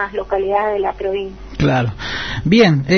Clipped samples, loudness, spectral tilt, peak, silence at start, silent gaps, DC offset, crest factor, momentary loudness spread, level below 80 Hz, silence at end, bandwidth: under 0.1%; -17 LUFS; -6.5 dB/octave; 0 dBFS; 0 s; none; under 0.1%; 16 dB; 11 LU; -36 dBFS; 0 s; 6.6 kHz